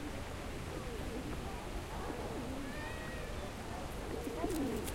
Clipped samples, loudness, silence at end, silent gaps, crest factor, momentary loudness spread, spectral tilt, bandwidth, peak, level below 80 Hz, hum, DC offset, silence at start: under 0.1%; -42 LUFS; 0 s; none; 18 dB; 6 LU; -5 dB/octave; 16 kHz; -22 dBFS; -48 dBFS; none; under 0.1%; 0 s